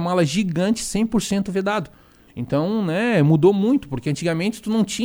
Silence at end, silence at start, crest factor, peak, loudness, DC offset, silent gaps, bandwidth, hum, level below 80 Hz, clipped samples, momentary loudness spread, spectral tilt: 0 s; 0 s; 16 dB; -4 dBFS; -20 LUFS; under 0.1%; none; over 20 kHz; none; -48 dBFS; under 0.1%; 9 LU; -6 dB/octave